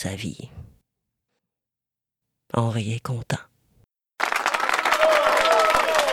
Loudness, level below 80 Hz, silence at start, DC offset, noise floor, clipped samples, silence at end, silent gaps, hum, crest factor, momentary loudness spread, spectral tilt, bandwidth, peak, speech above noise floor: -21 LUFS; -54 dBFS; 0 s; under 0.1%; -88 dBFS; under 0.1%; 0 s; none; none; 22 dB; 14 LU; -4 dB/octave; 16.5 kHz; -2 dBFS; 61 dB